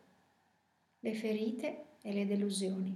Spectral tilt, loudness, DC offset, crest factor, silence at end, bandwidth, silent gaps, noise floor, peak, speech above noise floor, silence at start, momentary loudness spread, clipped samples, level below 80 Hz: -5.5 dB/octave; -37 LUFS; under 0.1%; 14 dB; 0 s; 13 kHz; none; -76 dBFS; -24 dBFS; 39 dB; 1.05 s; 8 LU; under 0.1%; under -90 dBFS